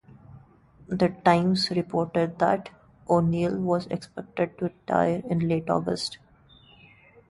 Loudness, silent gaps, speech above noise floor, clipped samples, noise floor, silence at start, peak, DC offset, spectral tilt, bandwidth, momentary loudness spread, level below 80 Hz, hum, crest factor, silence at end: -26 LUFS; none; 30 dB; under 0.1%; -55 dBFS; 0.3 s; -6 dBFS; under 0.1%; -6.5 dB/octave; 11.5 kHz; 12 LU; -58 dBFS; none; 20 dB; 1.15 s